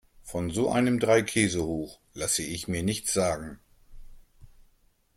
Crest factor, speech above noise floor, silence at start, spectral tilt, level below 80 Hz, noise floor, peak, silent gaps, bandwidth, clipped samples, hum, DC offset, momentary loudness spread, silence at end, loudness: 20 dB; 38 dB; 0.25 s; -4 dB/octave; -52 dBFS; -65 dBFS; -8 dBFS; none; 16.5 kHz; under 0.1%; none; under 0.1%; 12 LU; 0.7 s; -27 LUFS